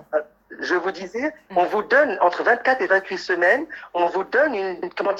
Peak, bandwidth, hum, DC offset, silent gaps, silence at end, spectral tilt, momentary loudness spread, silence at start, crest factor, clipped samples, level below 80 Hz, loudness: -4 dBFS; 8.4 kHz; none; under 0.1%; none; 0 s; -4.5 dB/octave; 9 LU; 0.1 s; 18 dB; under 0.1%; -66 dBFS; -21 LUFS